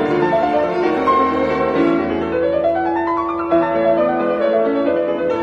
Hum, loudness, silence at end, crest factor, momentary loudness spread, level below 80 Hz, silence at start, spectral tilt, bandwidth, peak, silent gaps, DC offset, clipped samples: none; -17 LUFS; 0 s; 12 dB; 3 LU; -46 dBFS; 0 s; -7.5 dB/octave; 6.8 kHz; -4 dBFS; none; under 0.1%; under 0.1%